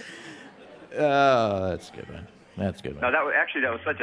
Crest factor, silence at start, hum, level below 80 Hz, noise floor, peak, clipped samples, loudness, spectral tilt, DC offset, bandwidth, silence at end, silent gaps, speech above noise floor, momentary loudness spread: 18 dB; 0 s; none; -56 dBFS; -47 dBFS; -8 dBFS; under 0.1%; -24 LUFS; -5.5 dB/octave; under 0.1%; 11 kHz; 0 s; none; 22 dB; 22 LU